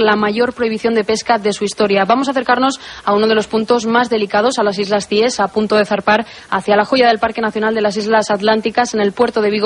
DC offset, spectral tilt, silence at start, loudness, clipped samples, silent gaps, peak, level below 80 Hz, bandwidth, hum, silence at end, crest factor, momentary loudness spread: under 0.1%; -4 dB/octave; 0 s; -15 LUFS; under 0.1%; none; 0 dBFS; -52 dBFS; 11 kHz; none; 0 s; 14 dB; 4 LU